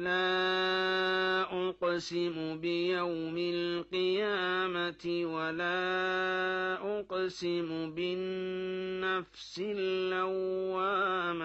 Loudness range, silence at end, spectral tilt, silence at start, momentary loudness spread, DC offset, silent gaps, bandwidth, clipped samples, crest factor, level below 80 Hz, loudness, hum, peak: 3 LU; 0 s; -5 dB/octave; 0 s; 6 LU; under 0.1%; none; 8 kHz; under 0.1%; 14 dB; -70 dBFS; -32 LUFS; none; -18 dBFS